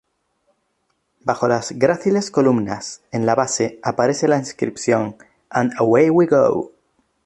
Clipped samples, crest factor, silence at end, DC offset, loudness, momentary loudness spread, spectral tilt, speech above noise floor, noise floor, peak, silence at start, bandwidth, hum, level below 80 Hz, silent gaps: under 0.1%; 16 dB; 0.55 s; under 0.1%; -19 LUFS; 12 LU; -5.5 dB/octave; 52 dB; -69 dBFS; -2 dBFS; 1.25 s; 11.5 kHz; none; -58 dBFS; none